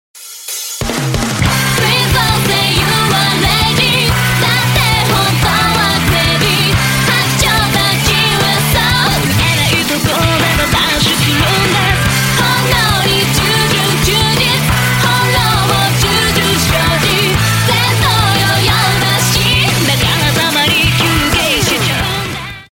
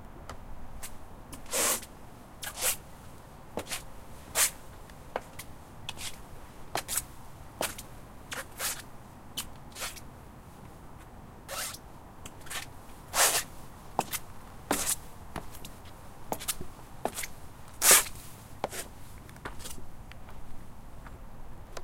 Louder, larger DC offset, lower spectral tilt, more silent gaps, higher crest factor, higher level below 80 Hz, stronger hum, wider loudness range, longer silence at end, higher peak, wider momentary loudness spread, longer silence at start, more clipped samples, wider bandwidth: first, -11 LUFS vs -31 LUFS; neither; first, -3.5 dB/octave vs -1 dB/octave; neither; second, 12 dB vs 32 dB; first, -28 dBFS vs -50 dBFS; neither; second, 1 LU vs 13 LU; about the same, 0.05 s vs 0 s; first, 0 dBFS vs -4 dBFS; second, 2 LU vs 23 LU; first, 0.15 s vs 0 s; neither; about the same, 17 kHz vs 16.5 kHz